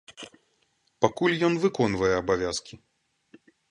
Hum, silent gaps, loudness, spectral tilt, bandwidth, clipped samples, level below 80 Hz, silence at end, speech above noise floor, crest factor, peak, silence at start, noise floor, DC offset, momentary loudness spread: none; none; -25 LUFS; -5 dB/octave; 11.5 kHz; under 0.1%; -54 dBFS; 0.95 s; 45 dB; 22 dB; -6 dBFS; 0.1 s; -70 dBFS; under 0.1%; 19 LU